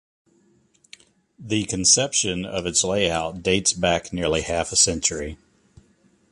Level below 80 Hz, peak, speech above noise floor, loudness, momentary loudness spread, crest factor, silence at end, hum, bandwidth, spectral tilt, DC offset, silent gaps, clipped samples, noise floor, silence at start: -44 dBFS; -2 dBFS; 39 dB; -21 LUFS; 10 LU; 22 dB; 0.95 s; none; 11.5 kHz; -2.5 dB/octave; under 0.1%; none; under 0.1%; -61 dBFS; 1.4 s